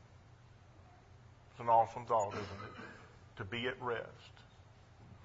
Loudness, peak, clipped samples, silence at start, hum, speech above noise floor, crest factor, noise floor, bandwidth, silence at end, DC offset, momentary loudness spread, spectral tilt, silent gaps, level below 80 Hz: -37 LUFS; -18 dBFS; under 0.1%; 0.05 s; none; 24 dB; 22 dB; -60 dBFS; 7.6 kHz; 0 s; under 0.1%; 26 LU; -3.5 dB/octave; none; -70 dBFS